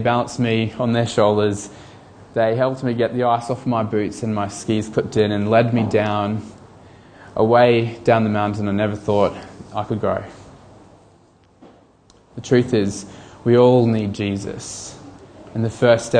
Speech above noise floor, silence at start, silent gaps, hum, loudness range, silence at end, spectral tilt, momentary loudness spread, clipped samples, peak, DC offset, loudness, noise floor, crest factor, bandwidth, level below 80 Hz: 35 dB; 0 s; none; none; 6 LU; 0 s; -6.5 dB/octave; 15 LU; under 0.1%; 0 dBFS; under 0.1%; -19 LUFS; -53 dBFS; 18 dB; 10 kHz; -52 dBFS